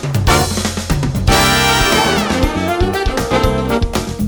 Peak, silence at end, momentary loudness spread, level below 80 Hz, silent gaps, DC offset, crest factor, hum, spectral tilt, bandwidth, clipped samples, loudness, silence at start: 0 dBFS; 0 s; 7 LU; -22 dBFS; none; under 0.1%; 14 dB; none; -4 dB/octave; over 20 kHz; under 0.1%; -14 LUFS; 0 s